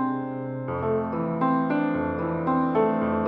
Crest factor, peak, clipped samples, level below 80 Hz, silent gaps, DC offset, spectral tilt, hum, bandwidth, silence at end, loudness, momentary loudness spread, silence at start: 14 dB; -10 dBFS; under 0.1%; -54 dBFS; none; under 0.1%; -11 dB/octave; none; 4.6 kHz; 0 s; -25 LUFS; 7 LU; 0 s